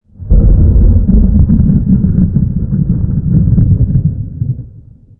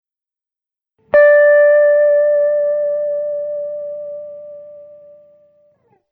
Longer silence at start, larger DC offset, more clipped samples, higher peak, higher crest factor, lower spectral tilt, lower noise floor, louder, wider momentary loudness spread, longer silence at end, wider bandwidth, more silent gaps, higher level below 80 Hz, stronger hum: second, 0.2 s vs 1.15 s; neither; neither; about the same, 0 dBFS vs -2 dBFS; about the same, 8 dB vs 12 dB; first, -17 dB/octave vs -6 dB/octave; second, -36 dBFS vs -89 dBFS; about the same, -11 LUFS vs -13 LUFS; second, 9 LU vs 21 LU; second, 0.5 s vs 1.25 s; second, 1.7 kHz vs 3.1 kHz; neither; first, -14 dBFS vs -62 dBFS; neither